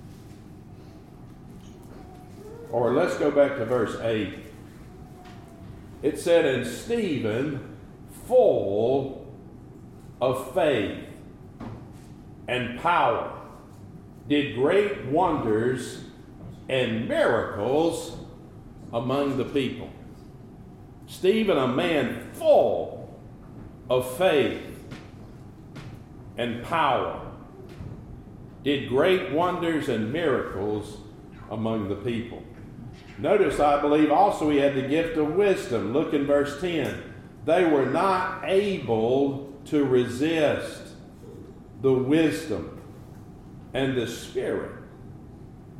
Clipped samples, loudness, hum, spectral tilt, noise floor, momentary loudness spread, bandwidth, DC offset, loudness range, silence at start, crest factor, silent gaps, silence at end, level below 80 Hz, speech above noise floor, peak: under 0.1%; -25 LUFS; none; -6 dB/octave; -45 dBFS; 23 LU; 15.5 kHz; under 0.1%; 6 LU; 0 s; 18 dB; none; 0 s; -52 dBFS; 21 dB; -8 dBFS